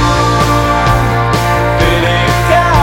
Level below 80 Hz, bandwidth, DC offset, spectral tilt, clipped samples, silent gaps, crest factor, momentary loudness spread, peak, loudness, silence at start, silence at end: -20 dBFS; 17 kHz; under 0.1%; -5.5 dB/octave; under 0.1%; none; 10 dB; 2 LU; 0 dBFS; -11 LUFS; 0 s; 0 s